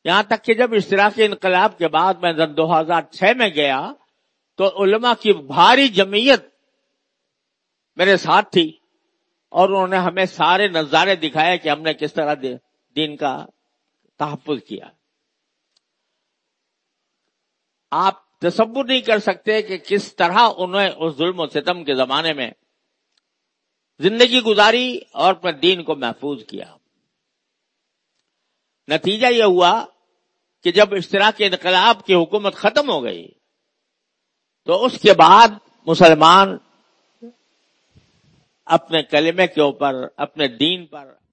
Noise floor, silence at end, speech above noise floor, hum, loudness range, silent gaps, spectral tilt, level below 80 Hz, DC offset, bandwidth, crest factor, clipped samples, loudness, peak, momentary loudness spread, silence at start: -76 dBFS; 0.3 s; 60 dB; none; 12 LU; none; -4.5 dB/octave; -64 dBFS; under 0.1%; 8.8 kHz; 18 dB; under 0.1%; -16 LUFS; 0 dBFS; 13 LU; 0.05 s